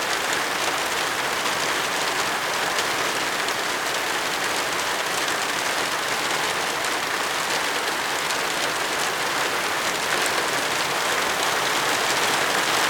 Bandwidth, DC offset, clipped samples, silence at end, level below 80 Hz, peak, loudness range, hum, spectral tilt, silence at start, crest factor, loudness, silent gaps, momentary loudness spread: 19.5 kHz; under 0.1%; under 0.1%; 0 s; -60 dBFS; -6 dBFS; 1 LU; none; -0.5 dB/octave; 0 s; 18 dB; -22 LUFS; none; 3 LU